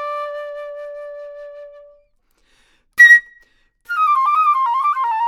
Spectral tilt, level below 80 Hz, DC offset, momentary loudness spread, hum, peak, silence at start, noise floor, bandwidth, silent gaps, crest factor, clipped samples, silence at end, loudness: 2 dB/octave; -64 dBFS; under 0.1%; 26 LU; none; 0 dBFS; 0 s; -61 dBFS; 16 kHz; none; 18 dB; under 0.1%; 0 s; -13 LUFS